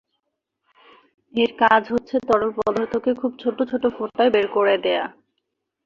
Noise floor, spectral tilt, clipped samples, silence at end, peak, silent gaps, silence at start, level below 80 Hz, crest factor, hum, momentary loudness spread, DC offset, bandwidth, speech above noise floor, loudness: -78 dBFS; -5.5 dB/octave; under 0.1%; 0.75 s; -2 dBFS; none; 1.35 s; -60 dBFS; 20 dB; none; 8 LU; under 0.1%; 7.4 kHz; 58 dB; -21 LUFS